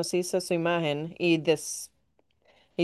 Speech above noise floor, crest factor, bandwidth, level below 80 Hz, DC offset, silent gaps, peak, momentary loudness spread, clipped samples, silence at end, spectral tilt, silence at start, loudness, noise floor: 44 dB; 18 dB; 12.5 kHz; -72 dBFS; under 0.1%; none; -10 dBFS; 12 LU; under 0.1%; 0 s; -4.5 dB/octave; 0 s; -28 LUFS; -72 dBFS